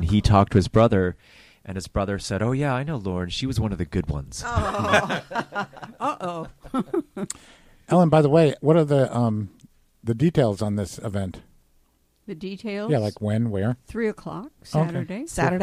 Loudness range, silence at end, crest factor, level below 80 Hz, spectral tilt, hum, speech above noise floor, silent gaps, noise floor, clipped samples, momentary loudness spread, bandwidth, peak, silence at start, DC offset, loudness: 7 LU; 0 s; 18 dB; -42 dBFS; -6.5 dB/octave; none; 41 dB; none; -63 dBFS; under 0.1%; 16 LU; 13.5 kHz; -4 dBFS; 0 s; under 0.1%; -23 LUFS